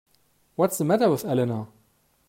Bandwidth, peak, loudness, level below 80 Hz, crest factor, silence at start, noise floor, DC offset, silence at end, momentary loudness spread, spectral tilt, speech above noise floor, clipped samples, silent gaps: 16 kHz; -8 dBFS; -24 LUFS; -68 dBFS; 18 dB; 0.6 s; -65 dBFS; under 0.1%; 0.6 s; 15 LU; -6 dB/octave; 42 dB; under 0.1%; none